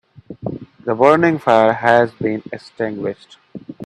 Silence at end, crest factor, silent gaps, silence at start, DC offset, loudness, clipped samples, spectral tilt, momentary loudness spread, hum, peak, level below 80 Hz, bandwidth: 0 s; 18 dB; none; 0.3 s; under 0.1%; -16 LUFS; under 0.1%; -7 dB/octave; 20 LU; none; 0 dBFS; -58 dBFS; 10.5 kHz